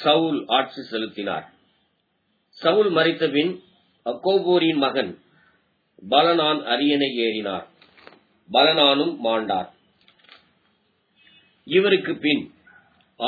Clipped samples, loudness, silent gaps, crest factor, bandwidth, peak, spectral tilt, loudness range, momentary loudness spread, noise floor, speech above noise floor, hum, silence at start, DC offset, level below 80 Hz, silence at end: under 0.1%; -21 LUFS; none; 20 dB; 4.9 kHz; -4 dBFS; -7 dB/octave; 4 LU; 13 LU; -70 dBFS; 49 dB; none; 0 s; under 0.1%; -74 dBFS; 0 s